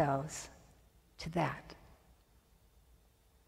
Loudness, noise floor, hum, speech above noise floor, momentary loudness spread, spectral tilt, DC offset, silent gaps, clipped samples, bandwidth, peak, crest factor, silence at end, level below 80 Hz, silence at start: -39 LUFS; -68 dBFS; none; 31 dB; 22 LU; -5.5 dB/octave; under 0.1%; none; under 0.1%; 16 kHz; -18 dBFS; 24 dB; 1.55 s; -62 dBFS; 0 s